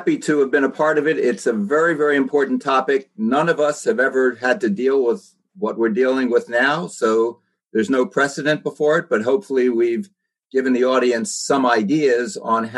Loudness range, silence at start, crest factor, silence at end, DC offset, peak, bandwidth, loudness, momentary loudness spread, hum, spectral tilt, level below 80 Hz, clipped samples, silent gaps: 1 LU; 0 s; 16 dB; 0 s; under 0.1%; -4 dBFS; 12 kHz; -19 LUFS; 5 LU; none; -5 dB/octave; -72 dBFS; under 0.1%; none